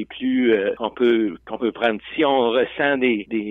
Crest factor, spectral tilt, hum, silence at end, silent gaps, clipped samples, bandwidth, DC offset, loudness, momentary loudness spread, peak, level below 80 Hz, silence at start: 14 dB; -7.5 dB/octave; none; 0 s; none; under 0.1%; 4 kHz; under 0.1%; -20 LUFS; 6 LU; -6 dBFS; -58 dBFS; 0 s